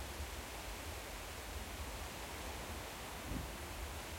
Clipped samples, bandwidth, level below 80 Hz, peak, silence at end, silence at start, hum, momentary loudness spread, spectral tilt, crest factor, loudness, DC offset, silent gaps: under 0.1%; 16.5 kHz; -52 dBFS; -30 dBFS; 0 s; 0 s; none; 2 LU; -3.5 dB/octave; 16 dB; -46 LUFS; under 0.1%; none